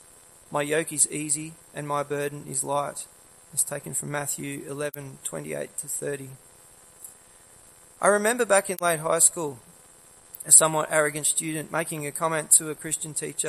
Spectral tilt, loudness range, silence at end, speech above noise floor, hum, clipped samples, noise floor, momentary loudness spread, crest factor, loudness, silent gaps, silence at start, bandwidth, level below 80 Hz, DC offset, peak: -2.5 dB/octave; 11 LU; 0 s; 27 dB; none; under 0.1%; -53 dBFS; 18 LU; 26 dB; -24 LUFS; none; 0.5 s; 16 kHz; -68 dBFS; under 0.1%; 0 dBFS